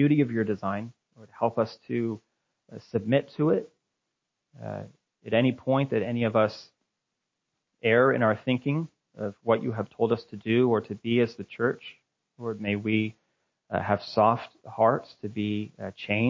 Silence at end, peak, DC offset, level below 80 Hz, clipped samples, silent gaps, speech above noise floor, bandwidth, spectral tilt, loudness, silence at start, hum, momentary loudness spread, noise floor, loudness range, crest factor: 0 s; -8 dBFS; under 0.1%; -62 dBFS; under 0.1%; none; 57 dB; 7.4 kHz; -8.5 dB/octave; -27 LUFS; 0 s; none; 15 LU; -83 dBFS; 4 LU; 20 dB